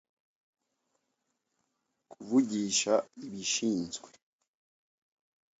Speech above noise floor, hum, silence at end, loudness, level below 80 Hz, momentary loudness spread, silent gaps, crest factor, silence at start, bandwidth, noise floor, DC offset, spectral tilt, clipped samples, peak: 51 dB; none; 1.55 s; -30 LUFS; -76 dBFS; 16 LU; none; 22 dB; 2.1 s; 8.2 kHz; -82 dBFS; under 0.1%; -3 dB/octave; under 0.1%; -14 dBFS